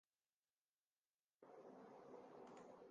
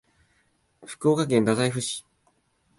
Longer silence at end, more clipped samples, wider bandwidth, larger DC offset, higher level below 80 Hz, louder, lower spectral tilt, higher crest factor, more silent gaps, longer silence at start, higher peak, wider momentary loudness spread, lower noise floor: second, 0 s vs 0.8 s; neither; second, 7.4 kHz vs 11.5 kHz; neither; second, under -90 dBFS vs -64 dBFS; second, -63 LUFS vs -24 LUFS; about the same, -5 dB/octave vs -5 dB/octave; about the same, 16 dB vs 20 dB; neither; first, 1.4 s vs 0.8 s; second, -50 dBFS vs -8 dBFS; second, 3 LU vs 13 LU; first, under -90 dBFS vs -68 dBFS